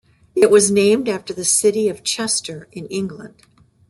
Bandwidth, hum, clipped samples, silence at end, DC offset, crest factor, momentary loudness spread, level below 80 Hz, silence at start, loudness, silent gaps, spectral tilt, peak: 12.5 kHz; none; under 0.1%; 0.6 s; under 0.1%; 18 dB; 16 LU; -60 dBFS; 0.35 s; -17 LUFS; none; -3 dB/octave; -2 dBFS